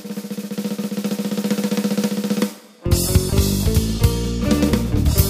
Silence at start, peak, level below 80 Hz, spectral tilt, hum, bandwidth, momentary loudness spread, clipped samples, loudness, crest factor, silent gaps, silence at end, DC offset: 0 s; -2 dBFS; -26 dBFS; -5.5 dB/octave; none; 15.5 kHz; 9 LU; under 0.1%; -20 LUFS; 18 dB; none; 0 s; under 0.1%